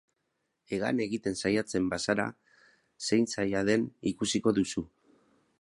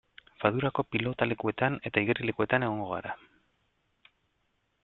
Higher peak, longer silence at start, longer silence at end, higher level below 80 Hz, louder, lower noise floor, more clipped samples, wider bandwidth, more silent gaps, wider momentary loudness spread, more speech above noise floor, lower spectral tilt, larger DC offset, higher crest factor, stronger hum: second, -12 dBFS vs -8 dBFS; first, 0.7 s vs 0.4 s; second, 0.75 s vs 1.65 s; about the same, -60 dBFS vs -62 dBFS; about the same, -30 LUFS vs -30 LUFS; first, -80 dBFS vs -75 dBFS; neither; first, 11.5 kHz vs 4.3 kHz; neither; about the same, 10 LU vs 8 LU; first, 51 dB vs 46 dB; second, -4.5 dB/octave vs -9.5 dB/octave; neither; about the same, 20 dB vs 24 dB; neither